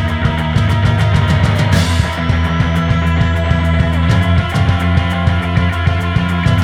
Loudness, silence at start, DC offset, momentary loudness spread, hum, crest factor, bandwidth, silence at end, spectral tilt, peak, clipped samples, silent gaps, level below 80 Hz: -14 LUFS; 0 s; under 0.1%; 3 LU; none; 12 dB; 12 kHz; 0 s; -6.5 dB/octave; 0 dBFS; under 0.1%; none; -22 dBFS